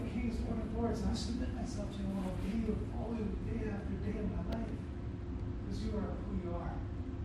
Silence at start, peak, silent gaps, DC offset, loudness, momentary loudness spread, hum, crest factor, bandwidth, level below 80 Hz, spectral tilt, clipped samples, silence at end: 0 s; -24 dBFS; none; under 0.1%; -39 LUFS; 5 LU; none; 14 dB; 12 kHz; -44 dBFS; -7.5 dB/octave; under 0.1%; 0 s